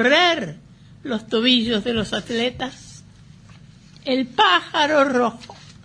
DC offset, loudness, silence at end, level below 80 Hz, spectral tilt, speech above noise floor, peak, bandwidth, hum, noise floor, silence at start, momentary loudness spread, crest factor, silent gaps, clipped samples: under 0.1%; -19 LUFS; 0.3 s; -52 dBFS; -4 dB/octave; 26 dB; -2 dBFS; 10.5 kHz; none; -46 dBFS; 0 s; 17 LU; 18 dB; none; under 0.1%